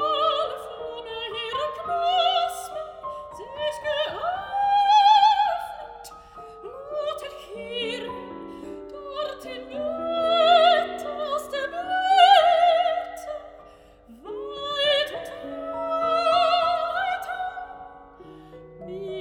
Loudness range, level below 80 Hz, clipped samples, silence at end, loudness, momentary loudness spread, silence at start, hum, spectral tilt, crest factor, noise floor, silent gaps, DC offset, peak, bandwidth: 12 LU; -60 dBFS; under 0.1%; 0 s; -23 LUFS; 21 LU; 0 s; none; -2.5 dB/octave; 20 dB; -50 dBFS; none; under 0.1%; -4 dBFS; 17 kHz